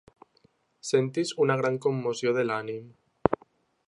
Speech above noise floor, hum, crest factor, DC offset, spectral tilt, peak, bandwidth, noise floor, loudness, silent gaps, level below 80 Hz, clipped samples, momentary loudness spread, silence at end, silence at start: 39 dB; none; 28 dB; under 0.1%; -5.5 dB/octave; -2 dBFS; 11.5 kHz; -66 dBFS; -28 LUFS; none; -60 dBFS; under 0.1%; 11 LU; 0.5 s; 0.85 s